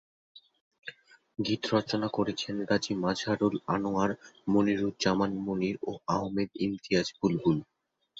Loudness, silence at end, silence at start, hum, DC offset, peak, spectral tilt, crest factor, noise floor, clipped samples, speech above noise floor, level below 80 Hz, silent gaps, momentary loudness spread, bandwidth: -30 LUFS; 0.55 s; 0.35 s; none; under 0.1%; -12 dBFS; -5.5 dB/octave; 18 dB; -49 dBFS; under 0.1%; 20 dB; -62 dBFS; 0.61-0.71 s; 8 LU; 7.8 kHz